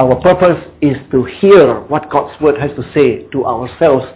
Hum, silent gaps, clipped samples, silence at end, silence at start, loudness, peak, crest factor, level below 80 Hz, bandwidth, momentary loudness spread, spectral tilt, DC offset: none; none; 0.2%; 0.05 s; 0 s; -12 LUFS; 0 dBFS; 12 dB; -40 dBFS; 4 kHz; 10 LU; -11 dB/octave; under 0.1%